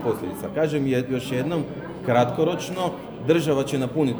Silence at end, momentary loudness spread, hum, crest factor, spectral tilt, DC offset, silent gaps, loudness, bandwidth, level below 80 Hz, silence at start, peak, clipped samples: 0 s; 8 LU; none; 18 dB; -6.5 dB/octave; under 0.1%; none; -24 LUFS; over 20 kHz; -56 dBFS; 0 s; -6 dBFS; under 0.1%